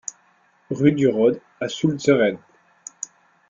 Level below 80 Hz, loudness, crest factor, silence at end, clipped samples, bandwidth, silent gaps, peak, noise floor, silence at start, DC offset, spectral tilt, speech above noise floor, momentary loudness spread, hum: -60 dBFS; -20 LUFS; 20 dB; 0.45 s; under 0.1%; 7.6 kHz; none; -4 dBFS; -60 dBFS; 0.7 s; under 0.1%; -5.5 dB/octave; 41 dB; 18 LU; none